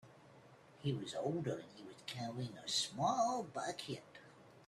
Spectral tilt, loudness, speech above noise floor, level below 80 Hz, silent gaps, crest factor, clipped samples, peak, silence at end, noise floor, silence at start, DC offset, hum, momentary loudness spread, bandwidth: -4 dB/octave; -41 LUFS; 22 dB; -78 dBFS; none; 20 dB; under 0.1%; -22 dBFS; 0 s; -62 dBFS; 0.05 s; under 0.1%; none; 16 LU; 13.5 kHz